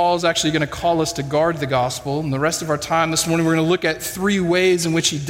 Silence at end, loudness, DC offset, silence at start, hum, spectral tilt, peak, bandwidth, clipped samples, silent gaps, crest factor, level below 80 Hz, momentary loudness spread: 0 s; -19 LUFS; under 0.1%; 0 s; none; -4 dB/octave; -4 dBFS; 16.5 kHz; under 0.1%; none; 14 dB; -48 dBFS; 5 LU